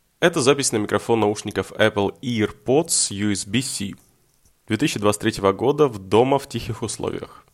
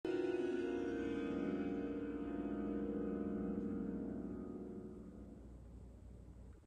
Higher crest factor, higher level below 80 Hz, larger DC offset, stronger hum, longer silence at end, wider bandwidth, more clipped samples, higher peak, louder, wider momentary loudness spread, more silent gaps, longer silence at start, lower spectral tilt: about the same, 18 dB vs 14 dB; first, -52 dBFS vs -60 dBFS; neither; neither; first, 0.2 s vs 0 s; first, 15.5 kHz vs 9.2 kHz; neither; first, -4 dBFS vs -28 dBFS; first, -21 LUFS vs -43 LUFS; second, 10 LU vs 17 LU; neither; first, 0.2 s vs 0.05 s; second, -4 dB/octave vs -8 dB/octave